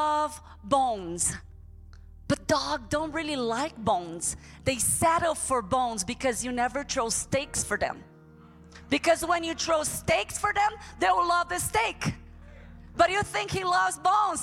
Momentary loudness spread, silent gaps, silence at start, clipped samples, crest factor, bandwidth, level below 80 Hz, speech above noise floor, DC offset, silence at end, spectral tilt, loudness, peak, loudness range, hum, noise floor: 7 LU; none; 0 s; under 0.1%; 18 dB; 17 kHz; -50 dBFS; 24 dB; under 0.1%; 0 s; -3 dB/octave; -27 LUFS; -10 dBFS; 3 LU; none; -52 dBFS